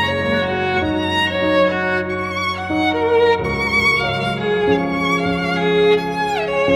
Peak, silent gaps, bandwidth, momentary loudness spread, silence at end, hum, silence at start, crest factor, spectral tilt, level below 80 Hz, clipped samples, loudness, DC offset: -4 dBFS; none; 16 kHz; 5 LU; 0 s; none; 0 s; 14 dB; -5.5 dB/octave; -42 dBFS; under 0.1%; -17 LUFS; under 0.1%